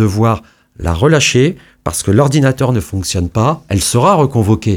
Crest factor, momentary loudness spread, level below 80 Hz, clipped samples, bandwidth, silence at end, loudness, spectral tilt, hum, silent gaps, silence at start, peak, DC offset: 12 dB; 9 LU; -32 dBFS; under 0.1%; 17 kHz; 0 s; -13 LUFS; -5.5 dB/octave; none; none; 0 s; 0 dBFS; under 0.1%